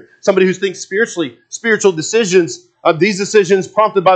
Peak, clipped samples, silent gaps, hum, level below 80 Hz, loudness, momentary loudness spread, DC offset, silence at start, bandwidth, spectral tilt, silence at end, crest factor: 0 dBFS; under 0.1%; none; none; -66 dBFS; -14 LUFS; 8 LU; under 0.1%; 0.25 s; 9 kHz; -4 dB/octave; 0 s; 14 dB